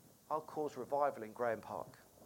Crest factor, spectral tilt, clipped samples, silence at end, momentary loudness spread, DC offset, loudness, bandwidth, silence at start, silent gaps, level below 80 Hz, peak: 20 dB; -6 dB/octave; under 0.1%; 0 s; 10 LU; under 0.1%; -41 LUFS; 17 kHz; 0.05 s; none; -80 dBFS; -20 dBFS